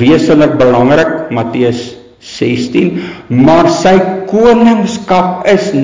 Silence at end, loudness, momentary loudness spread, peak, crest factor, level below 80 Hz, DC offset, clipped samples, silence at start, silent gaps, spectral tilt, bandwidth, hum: 0 s; -9 LUFS; 9 LU; 0 dBFS; 8 dB; -40 dBFS; under 0.1%; 0.1%; 0 s; none; -6.5 dB/octave; 7.6 kHz; none